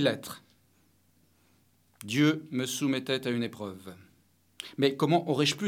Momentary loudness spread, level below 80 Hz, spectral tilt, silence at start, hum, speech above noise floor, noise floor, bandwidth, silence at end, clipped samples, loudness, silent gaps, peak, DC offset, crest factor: 20 LU; -78 dBFS; -5 dB/octave; 0 s; none; 38 dB; -67 dBFS; 16.5 kHz; 0 s; under 0.1%; -29 LUFS; none; -10 dBFS; under 0.1%; 20 dB